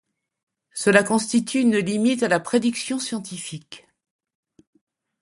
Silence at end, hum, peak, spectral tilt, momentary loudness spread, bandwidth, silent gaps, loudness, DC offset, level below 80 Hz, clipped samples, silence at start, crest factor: 1.45 s; none; -2 dBFS; -4 dB/octave; 15 LU; 11.5 kHz; none; -21 LUFS; under 0.1%; -66 dBFS; under 0.1%; 0.75 s; 20 dB